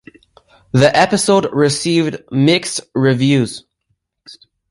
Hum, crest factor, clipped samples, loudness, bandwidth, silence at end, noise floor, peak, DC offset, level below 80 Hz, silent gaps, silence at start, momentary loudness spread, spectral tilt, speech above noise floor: none; 16 dB; under 0.1%; -14 LUFS; 11.5 kHz; 0.35 s; -68 dBFS; 0 dBFS; under 0.1%; -52 dBFS; none; 0.75 s; 8 LU; -5 dB/octave; 54 dB